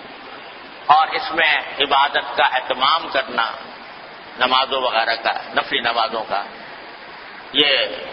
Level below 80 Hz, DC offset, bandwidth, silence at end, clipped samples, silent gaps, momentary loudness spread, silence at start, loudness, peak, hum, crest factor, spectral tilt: -60 dBFS; under 0.1%; 5.8 kHz; 0 s; under 0.1%; none; 20 LU; 0 s; -18 LUFS; 0 dBFS; none; 20 dB; -5 dB/octave